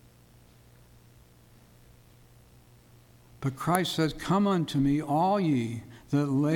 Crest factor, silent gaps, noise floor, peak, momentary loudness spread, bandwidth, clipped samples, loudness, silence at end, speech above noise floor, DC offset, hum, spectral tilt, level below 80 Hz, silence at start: 24 dB; none; -57 dBFS; -6 dBFS; 10 LU; 19 kHz; under 0.1%; -27 LUFS; 0 s; 30 dB; under 0.1%; none; -6.5 dB/octave; -56 dBFS; 3.4 s